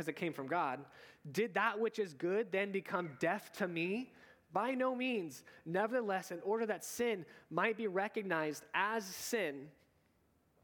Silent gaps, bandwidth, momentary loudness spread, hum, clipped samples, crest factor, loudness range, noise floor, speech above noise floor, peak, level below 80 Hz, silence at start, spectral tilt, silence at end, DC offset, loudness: none; 19 kHz; 8 LU; none; under 0.1%; 20 dB; 1 LU; -74 dBFS; 36 dB; -18 dBFS; -84 dBFS; 0 s; -4.5 dB/octave; 0.95 s; under 0.1%; -38 LUFS